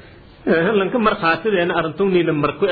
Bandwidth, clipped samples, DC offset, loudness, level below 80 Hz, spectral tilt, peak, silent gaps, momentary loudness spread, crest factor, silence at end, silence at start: 4.9 kHz; under 0.1%; under 0.1%; -18 LUFS; -48 dBFS; -9.5 dB/octave; -4 dBFS; none; 3 LU; 14 dB; 0 s; 0.45 s